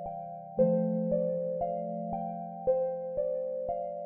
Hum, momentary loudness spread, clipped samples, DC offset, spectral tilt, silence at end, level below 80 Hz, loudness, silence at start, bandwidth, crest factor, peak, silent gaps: none; 9 LU; under 0.1%; under 0.1%; -12.5 dB/octave; 0 s; -60 dBFS; -32 LUFS; 0 s; 2.8 kHz; 16 dB; -14 dBFS; none